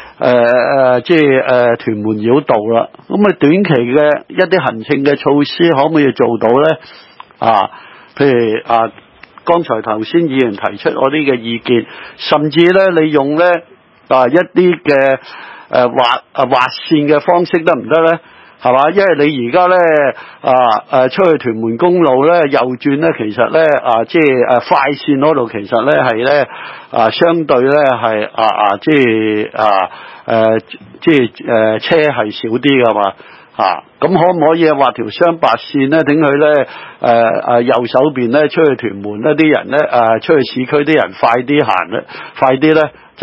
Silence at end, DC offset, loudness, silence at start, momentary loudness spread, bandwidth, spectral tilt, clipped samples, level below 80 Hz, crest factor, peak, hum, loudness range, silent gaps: 0 s; under 0.1%; -12 LUFS; 0 s; 7 LU; 8 kHz; -8 dB/octave; 0.2%; -56 dBFS; 12 dB; 0 dBFS; none; 2 LU; none